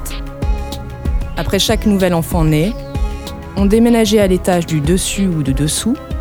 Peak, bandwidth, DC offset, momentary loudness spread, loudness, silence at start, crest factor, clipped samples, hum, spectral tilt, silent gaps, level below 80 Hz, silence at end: 0 dBFS; over 20 kHz; under 0.1%; 12 LU; -15 LUFS; 0 s; 14 dB; under 0.1%; none; -5.5 dB/octave; none; -22 dBFS; 0 s